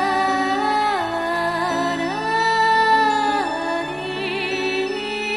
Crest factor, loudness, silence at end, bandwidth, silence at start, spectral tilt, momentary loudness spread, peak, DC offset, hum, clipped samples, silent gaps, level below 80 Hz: 16 dB; -20 LUFS; 0 s; 12.5 kHz; 0 s; -3.5 dB/octave; 8 LU; -4 dBFS; under 0.1%; none; under 0.1%; none; -54 dBFS